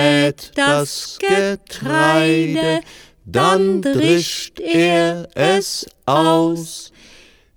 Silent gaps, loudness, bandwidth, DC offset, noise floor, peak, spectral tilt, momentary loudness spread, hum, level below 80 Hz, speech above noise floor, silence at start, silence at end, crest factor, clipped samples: none; -17 LUFS; 19.5 kHz; under 0.1%; -47 dBFS; 0 dBFS; -4.5 dB/octave; 10 LU; none; -52 dBFS; 30 dB; 0 s; 0.7 s; 16 dB; under 0.1%